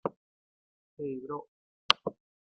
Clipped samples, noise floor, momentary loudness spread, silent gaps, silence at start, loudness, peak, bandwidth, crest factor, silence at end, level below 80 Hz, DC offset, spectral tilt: under 0.1%; under -90 dBFS; 14 LU; 0.16-0.97 s, 1.48-1.89 s; 0.05 s; -32 LUFS; -2 dBFS; 7.4 kHz; 36 dB; 0.45 s; -78 dBFS; under 0.1%; -0.5 dB/octave